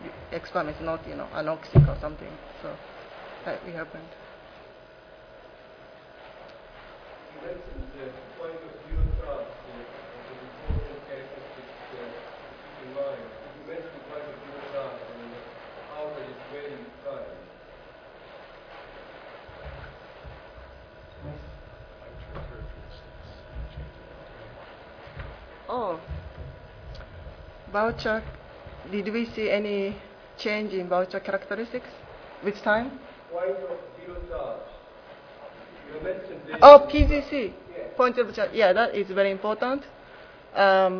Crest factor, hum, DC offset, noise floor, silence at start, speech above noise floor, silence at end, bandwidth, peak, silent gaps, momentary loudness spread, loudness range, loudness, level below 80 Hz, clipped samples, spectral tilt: 28 dB; none; under 0.1%; -49 dBFS; 0 s; 27 dB; 0 s; 5.4 kHz; 0 dBFS; none; 23 LU; 25 LU; -24 LUFS; -40 dBFS; under 0.1%; -7.5 dB/octave